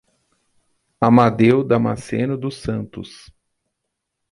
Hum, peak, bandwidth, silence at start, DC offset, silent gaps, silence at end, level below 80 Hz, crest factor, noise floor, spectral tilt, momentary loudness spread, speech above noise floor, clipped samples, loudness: none; -2 dBFS; 11.5 kHz; 1 s; under 0.1%; none; 1.25 s; -50 dBFS; 18 dB; -78 dBFS; -8 dB/octave; 18 LU; 61 dB; under 0.1%; -18 LUFS